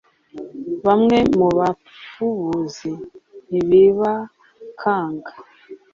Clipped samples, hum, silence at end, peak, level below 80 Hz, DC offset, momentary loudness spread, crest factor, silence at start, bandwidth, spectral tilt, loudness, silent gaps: under 0.1%; none; 0.2 s; -4 dBFS; -52 dBFS; under 0.1%; 22 LU; 16 dB; 0.35 s; 7.4 kHz; -7 dB/octave; -18 LUFS; none